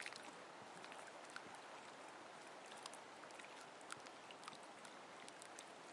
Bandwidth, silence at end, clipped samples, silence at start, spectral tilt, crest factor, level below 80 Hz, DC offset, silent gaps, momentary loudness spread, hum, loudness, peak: 12 kHz; 0 s; under 0.1%; 0 s; -1.5 dB/octave; 28 dB; under -90 dBFS; under 0.1%; none; 2 LU; none; -56 LUFS; -28 dBFS